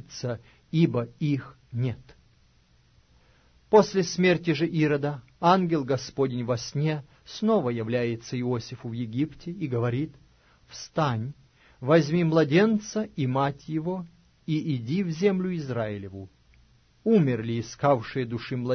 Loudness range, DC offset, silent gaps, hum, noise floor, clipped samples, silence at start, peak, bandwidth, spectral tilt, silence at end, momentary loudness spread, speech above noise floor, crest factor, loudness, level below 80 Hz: 6 LU; under 0.1%; none; none; -61 dBFS; under 0.1%; 0.1 s; -6 dBFS; 6.6 kHz; -6.5 dB/octave; 0 s; 14 LU; 36 dB; 22 dB; -26 LUFS; -60 dBFS